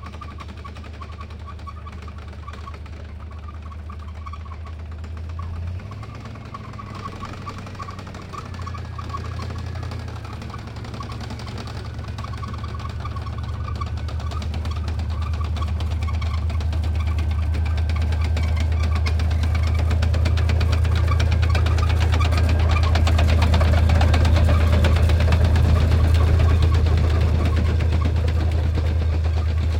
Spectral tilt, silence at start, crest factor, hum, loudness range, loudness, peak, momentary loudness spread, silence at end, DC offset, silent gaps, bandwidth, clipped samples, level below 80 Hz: -6.5 dB/octave; 0 s; 16 dB; none; 16 LU; -21 LUFS; -6 dBFS; 18 LU; 0 s; under 0.1%; none; 9.4 kHz; under 0.1%; -26 dBFS